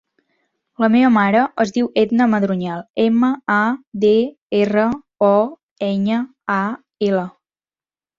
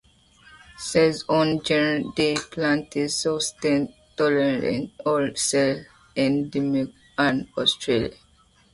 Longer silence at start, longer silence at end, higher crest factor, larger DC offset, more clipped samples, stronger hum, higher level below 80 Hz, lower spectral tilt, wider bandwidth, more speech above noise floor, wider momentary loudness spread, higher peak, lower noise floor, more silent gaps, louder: about the same, 0.8 s vs 0.8 s; first, 0.9 s vs 0.6 s; about the same, 16 dB vs 16 dB; neither; neither; neither; about the same, -60 dBFS vs -56 dBFS; first, -7 dB/octave vs -4 dB/octave; second, 7.4 kHz vs 11.5 kHz; first, over 74 dB vs 36 dB; about the same, 8 LU vs 6 LU; first, -2 dBFS vs -6 dBFS; first, under -90 dBFS vs -58 dBFS; first, 2.90-2.94 s, 3.87-3.92 s, 4.38-4.50 s, 5.63-5.76 s vs none; first, -18 LUFS vs -23 LUFS